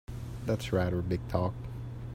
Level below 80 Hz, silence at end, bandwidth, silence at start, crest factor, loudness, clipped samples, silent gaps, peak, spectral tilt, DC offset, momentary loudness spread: -46 dBFS; 0 s; 16 kHz; 0.1 s; 20 dB; -33 LUFS; under 0.1%; none; -12 dBFS; -7.5 dB/octave; under 0.1%; 11 LU